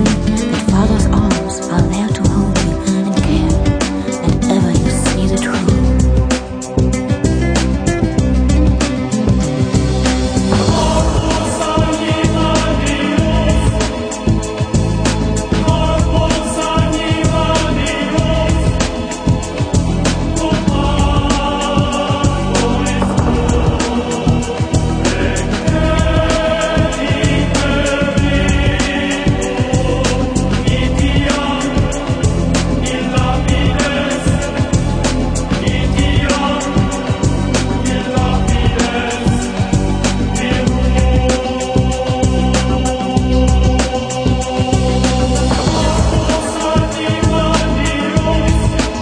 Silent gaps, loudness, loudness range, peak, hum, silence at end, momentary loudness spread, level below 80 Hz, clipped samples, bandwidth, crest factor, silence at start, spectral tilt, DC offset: none; -15 LUFS; 1 LU; 0 dBFS; none; 0 s; 3 LU; -20 dBFS; under 0.1%; 10 kHz; 12 dB; 0 s; -5.5 dB/octave; under 0.1%